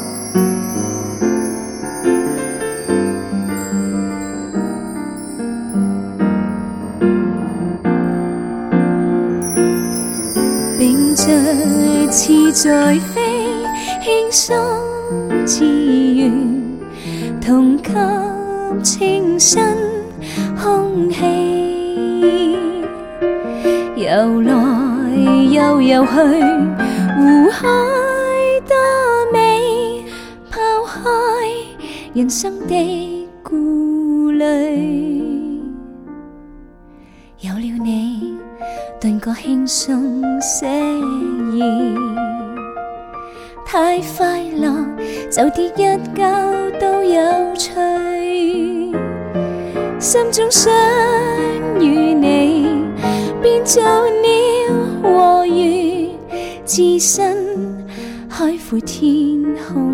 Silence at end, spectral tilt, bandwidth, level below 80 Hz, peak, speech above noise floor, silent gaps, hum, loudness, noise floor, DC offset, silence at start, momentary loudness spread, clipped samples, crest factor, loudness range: 0 s; -4 dB/octave; 17.5 kHz; -44 dBFS; 0 dBFS; 29 dB; none; none; -15 LUFS; -42 dBFS; under 0.1%; 0 s; 13 LU; under 0.1%; 16 dB; 7 LU